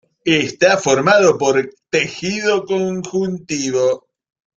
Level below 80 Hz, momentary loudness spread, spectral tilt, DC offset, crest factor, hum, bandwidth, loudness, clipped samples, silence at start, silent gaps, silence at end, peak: -58 dBFS; 9 LU; -4 dB/octave; under 0.1%; 16 dB; none; 7.8 kHz; -16 LUFS; under 0.1%; 0.25 s; none; 0.6 s; 0 dBFS